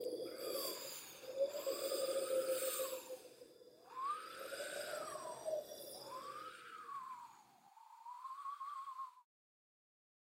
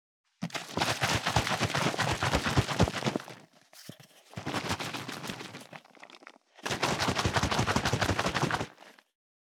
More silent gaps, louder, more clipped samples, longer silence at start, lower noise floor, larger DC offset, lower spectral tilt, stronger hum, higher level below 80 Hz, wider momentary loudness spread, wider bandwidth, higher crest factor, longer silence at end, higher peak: neither; second, -44 LUFS vs -30 LUFS; neither; second, 0 s vs 0.4 s; first, -65 dBFS vs -55 dBFS; neither; second, -1 dB/octave vs -4 dB/octave; neither; second, -90 dBFS vs -50 dBFS; second, 16 LU vs 20 LU; second, 16 kHz vs 18.5 kHz; about the same, 18 dB vs 20 dB; first, 1.05 s vs 0.5 s; second, -28 dBFS vs -12 dBFS